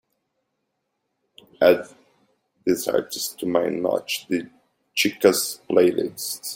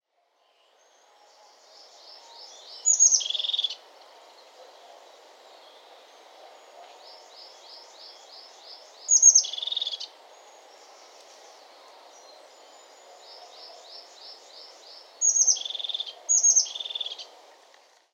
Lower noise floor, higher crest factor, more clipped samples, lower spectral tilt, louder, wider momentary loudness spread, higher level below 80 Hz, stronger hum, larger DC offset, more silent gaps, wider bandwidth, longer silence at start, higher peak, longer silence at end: first, -77 dBFS vs -69 dBFS; about the same, 22 dB vs 26 dB; neither; first, -3.5 dB/octave vs 7.5 dB/octave; about the same, -22 LUFS vs -21 LUFS; second, 10 LU vs 29 LU; first, -66 dBFS vs under -90 dBFS; neither; neither; neither; about the same, 16.5 kHz vs 15.5 kHz; second, 1.6 s vs 2.4 s; about the same, -2 dBFS vs -4 dBFS; second, 0 s vs 0.9 s